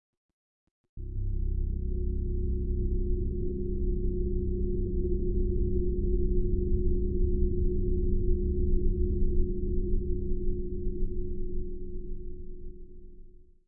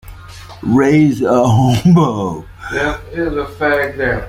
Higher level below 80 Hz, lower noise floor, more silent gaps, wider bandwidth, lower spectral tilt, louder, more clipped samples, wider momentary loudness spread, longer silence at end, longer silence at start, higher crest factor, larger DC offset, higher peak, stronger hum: first, -30 dBFS vs -36 dBFS; first, -49 dBFS vs -33 dBFS; neither; second, 0.6 kHz vs 16 kHz; first, -16 dB/octave vs -7 dB/octave; second, -33 LUFS vs -14 LUFS; neither; about the same, 12 LU vs 12 LU; first, 0.25 s vs 0 s; first, 0.95 s vs 0.05 s; about the same, 14 dB vs 12 dB; neither; second, -14 dBFS vs -2 dBFS; neither